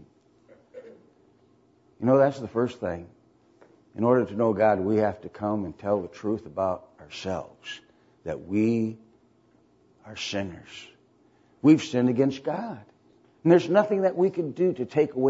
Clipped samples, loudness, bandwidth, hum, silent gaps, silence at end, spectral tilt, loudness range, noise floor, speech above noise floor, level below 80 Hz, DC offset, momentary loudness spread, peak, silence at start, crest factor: under 0.1%; -25 LUFS; 8 kHz; none; none; 0 s; -7 dB/octave; 8 LU; -62 dBFS; 37 dB; -64 dBFS; under 0.1%; 19 LU; -6 dBFS; 0.75 s; 20 dB